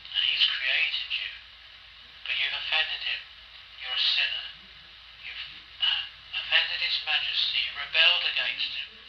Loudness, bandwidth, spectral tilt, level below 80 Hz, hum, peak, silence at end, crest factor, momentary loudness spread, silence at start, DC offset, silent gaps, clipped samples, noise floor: -25 LUFS; 6.8 kHz; 0 dB/octave; -64 dBFS; none; -8 dBFS; 0 s; 22 dB; 18 LU; 0 s; under 0.1%; none; under 0.1%; -49 dBFS